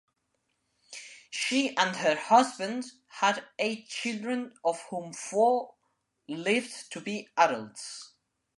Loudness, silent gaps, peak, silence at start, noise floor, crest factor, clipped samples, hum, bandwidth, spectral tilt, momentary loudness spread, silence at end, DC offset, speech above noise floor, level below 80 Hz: -29 LUFS; none; -8 dBFS; 0.9 s; -78 dBFS; 22 dB; under 0.1%; none; 11.5 kHz; -3 dB/octave; 17 LU; 0.5 s; under 0.1%; 49 dB; -84 dBFS